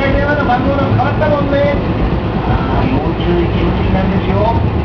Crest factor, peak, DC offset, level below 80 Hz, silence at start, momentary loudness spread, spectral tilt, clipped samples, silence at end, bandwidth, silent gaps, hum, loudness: 12 dB; 0 dBFS; under 0.1%; -22 dBFS; 0 s; 3 LU; -9 dB/octave; under 0.1%; 0 s; 5.4 kHz; none; none; -14 LUFS